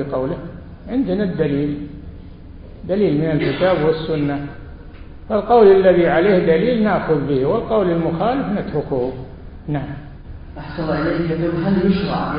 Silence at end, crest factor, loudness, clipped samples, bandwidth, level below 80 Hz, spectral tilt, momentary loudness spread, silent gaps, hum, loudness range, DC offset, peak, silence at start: 0 s; 18 dB; -18 LUFS; under 0.1%; 5.2 kHz; -38 dBFS; -12.5 dB/octave; 21 LU; none; none; 8 LU; under 0.1%; 0 dBFS; 0 s